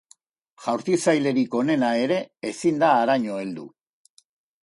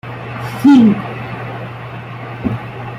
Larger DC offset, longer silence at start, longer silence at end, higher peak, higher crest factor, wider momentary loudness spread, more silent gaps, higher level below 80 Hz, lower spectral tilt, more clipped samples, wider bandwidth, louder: neither; first, 0.6 s vs 0.05 s; first, 0.95 s vs 0 s; second, -6 dBFS vs -2 dBFS; about the same, 18 dB vs 14 dB; second, 13 LU vs 19 LU; neither; second, -70 dBFS vs -46 dBFS; second, -5 dB/octave vs -7.5 dB/octave; neither; second, 11.5 kHz vs 13.5 kHz; second, -23 LUFS vs -15 LUFS